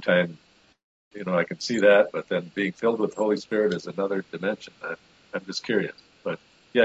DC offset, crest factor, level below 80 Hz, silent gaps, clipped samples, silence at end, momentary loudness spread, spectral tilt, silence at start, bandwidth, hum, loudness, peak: under 0.1%; 20 dB; -70 dBFS; 0.84-1.11 s; under 0.1%; 0 s; 16 LU; -5.5 dB/octave; 0 s; 8 kHz; none; -26 LUFS; -4 dBFS